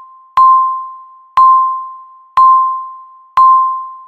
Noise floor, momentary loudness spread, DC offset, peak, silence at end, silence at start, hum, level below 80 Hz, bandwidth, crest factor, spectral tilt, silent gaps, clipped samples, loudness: -34 dBFS; 15 LU; under 0.1%; 0 dBFS; 0.05 s; 0.35 s; none; -52 dBFS; 4.6 kHz; 12 dB; -2 dB/octave; none; under 0.1%; -10 LUFS